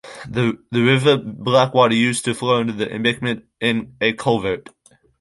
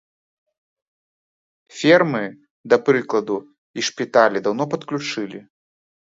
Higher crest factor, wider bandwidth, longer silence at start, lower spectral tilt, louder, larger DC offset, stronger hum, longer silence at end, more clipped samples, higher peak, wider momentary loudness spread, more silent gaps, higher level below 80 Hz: about the same, 18 dB vs 22 dB; first, 11.5 kHz vs 7.8 kHz; second, 0.05 s vs 1.75 s; about the same, -5 dB/octave vs -4.5 dB/octave; about the same, -19 LUFS vs -20 LUFS; neither; neither; about the same, 0.6 s vs 0.6 s; neither; about the same, -2 dBFS vs 0 dBFS; second, 9 LU vs 16 LU; second, none vs 2.50-2.64 s, 3.58-3.74 s; first, -54 dBFS vs -70 dBFS